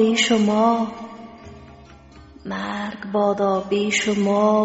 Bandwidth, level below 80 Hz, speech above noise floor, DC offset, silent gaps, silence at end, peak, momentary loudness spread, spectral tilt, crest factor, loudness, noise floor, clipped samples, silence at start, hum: 8 kHz; -54 dBFS; 26 dB; under 0.1%; none; 0 s; -6 dBFS; 21 LU; -3.5 dB/octave; 16 dB; -20 LUFS; -45 dBFS; under 0.1%; 0 s; none